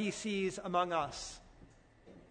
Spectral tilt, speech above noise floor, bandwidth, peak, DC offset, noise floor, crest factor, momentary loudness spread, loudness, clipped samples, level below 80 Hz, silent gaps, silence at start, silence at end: -4 dB/octave; 24 dB; 9.6 kHz; -20 dBFS; under 0.1%; -61 dBFS; 18 dB; 13 LU; -36 LUFS; under 0.1%; -62 dBFS; none; 0 s; 0.05 s